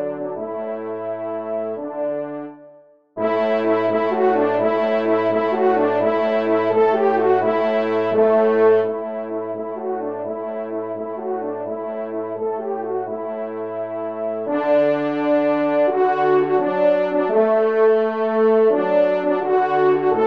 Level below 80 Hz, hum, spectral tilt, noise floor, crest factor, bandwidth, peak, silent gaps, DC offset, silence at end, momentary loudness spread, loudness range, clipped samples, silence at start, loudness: -72 dBFS; none; -8 dB/octave; -48 dBFS; 14 dB; 5.6 kHz; -6 dBFS; none; 0.2%; 0 s; 11 LU; 9 LU; under 0.1%; 0 s; -20 LUFS